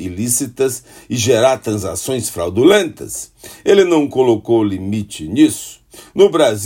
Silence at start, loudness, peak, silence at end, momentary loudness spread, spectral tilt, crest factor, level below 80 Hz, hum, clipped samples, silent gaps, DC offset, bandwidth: 0 s; -15 LUFS; 0 dBFS; 0 s; 15 LU; -4.5 dB/octave; 14 dB; -52 dBFS; none; under 0.1%; none; under 0.1%; 16.5 kHz